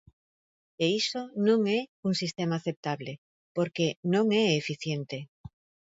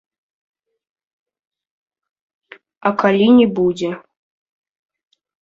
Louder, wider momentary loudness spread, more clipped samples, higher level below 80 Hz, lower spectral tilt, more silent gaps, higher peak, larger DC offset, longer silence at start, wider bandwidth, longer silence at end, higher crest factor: second, -29 LUFS vs -15 LUFS; about the same, 13 LU vs 13 LU; neither; second, -68 dBFS vs -60 dBFS; second, -5.5 dB/octave vs -7 dB/octave; first, 1.88-2.03 s, 2.77-2.83 s, 3.18-3.55 s, 3.96-4.03 s vs none; second, -12 dBFS vs -2 dBFS; neither; second, 0.8 s vs 2.85 s; about the same, 8 kHz vs 7.8 kHz; second, 0.6 s vs 1.45 s; about the same, 18 dB vs 18 dB